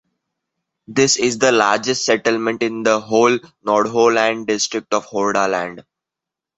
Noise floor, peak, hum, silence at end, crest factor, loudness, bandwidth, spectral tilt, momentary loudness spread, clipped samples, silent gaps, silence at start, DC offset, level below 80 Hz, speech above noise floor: -85 dBFS; 0 dBFS; none; 0.75 s; 18 dB; -17 LUFS; 8.2 kHz; -3 dB/octave; 7 LU; under 0.1%; none; 0.9 s; under 0.1%; -60 dBFS; 68 dB